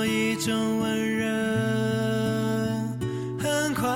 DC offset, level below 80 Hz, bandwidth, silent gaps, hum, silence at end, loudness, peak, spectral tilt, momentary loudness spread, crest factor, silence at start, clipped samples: under 0.1%; -56 dBFS; 16.5 kHz; none; none; 0 s; -26 LUFS; -14 dBFS; -5 dB/octave; 4 LU; 12 dB; 0 s; under 0.1%